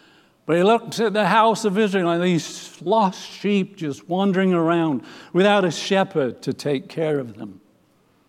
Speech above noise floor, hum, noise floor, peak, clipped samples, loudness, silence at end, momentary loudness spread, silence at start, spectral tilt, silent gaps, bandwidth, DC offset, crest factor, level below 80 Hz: 40 dB; none; -60 dBFS; -4 dBFS; under 0.1%; -21 LUFS; 0.75 s; 12 LU; 0.5 s; -5.5 dB/octave; none; 14 kHz; under 0.1%; 16 dB; -76 dBFS